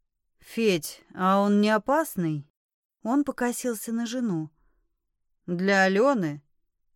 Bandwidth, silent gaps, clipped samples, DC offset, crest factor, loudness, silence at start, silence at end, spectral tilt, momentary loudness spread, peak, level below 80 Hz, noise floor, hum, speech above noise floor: 17.5 kHz; 2.50-2.90 s; under 0.1%; under 0.1%; 18 dB; -25 LUFS; 0.5 s; 0.55 s; -5.5 dB/octave; 15 LU; -8 dBFS; -68 dBFS; -76 dBFS; none; 51 dB